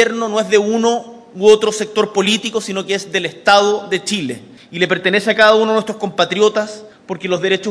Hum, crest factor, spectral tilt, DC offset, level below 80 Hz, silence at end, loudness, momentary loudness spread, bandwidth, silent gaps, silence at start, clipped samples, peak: none; 16 dB; -3.5 dB/octave; under 0.1%; -60 dBFS; 0 s; -15 LUFS; 13 LU; 11 kHz; none; 0 s; 0.1%; 0 dBFS